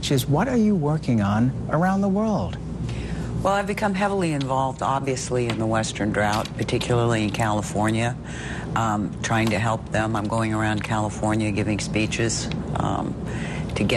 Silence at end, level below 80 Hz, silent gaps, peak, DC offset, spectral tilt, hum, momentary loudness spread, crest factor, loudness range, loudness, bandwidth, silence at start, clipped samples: 0 s; -40 dBFS; none; -10 dBFS; under 0.1%; -5.5 dB/octave; none; 7 LU; 14 dB; 1 LU; -23 LUFS; 13 kHz; 0 s; under 0.1%